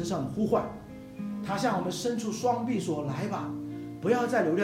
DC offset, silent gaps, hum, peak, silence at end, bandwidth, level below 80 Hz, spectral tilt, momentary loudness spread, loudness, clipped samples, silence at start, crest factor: under 0.1%; none; none; -12 dBFS; 0 s; 16 kHz; -60 dBFS; -5.5 dB/octave; 12 LU; -30 LUFS; under 0.1%; 0 s; 18 dB